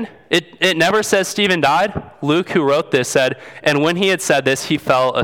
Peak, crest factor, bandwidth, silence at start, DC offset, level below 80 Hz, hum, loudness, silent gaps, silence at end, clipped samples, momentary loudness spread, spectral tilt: 0 dBFS; 16 dB; 19 kHz; 0 s; under 0.1%; -52 dBFS; none; -16 LUFS; none; 0 s; under 0.1%; 5 LU; -4 dB/octave